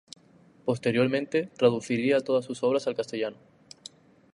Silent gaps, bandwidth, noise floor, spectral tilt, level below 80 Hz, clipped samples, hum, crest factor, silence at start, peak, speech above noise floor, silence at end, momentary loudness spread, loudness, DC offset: none; 11 kHz; -58 dBFS; -6 dB/octave; -72 dBFS; under 0.1%; none; 18 dB; 0.65 s; -10 dBFS; 31 dB; 1 s; 18 LU; -27 LUFS; under 0.1%